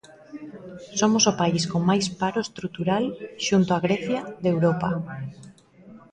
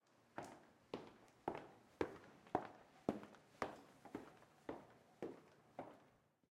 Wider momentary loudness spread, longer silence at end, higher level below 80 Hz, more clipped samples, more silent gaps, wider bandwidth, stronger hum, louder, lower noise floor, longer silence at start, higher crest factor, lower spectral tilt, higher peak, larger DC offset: first, 20 LU vs 16 LU; second, 0.15 s vs 0.4 s; first, -58 dBFS vs -80 dBFS; neither; neither; second, 9.8 kHz vs 16 kHz; neither; first, -24 LUFS vs -52 LUFS; second, -49 dBFS vs -74 dBFS; about the same, 0.3 s vs 0.3 s; second, 20 dB vs 30 dB; second, -4.5 dB/octave vs -6 dB/octave; first, -6 dBFS vs -22 dBFS; neither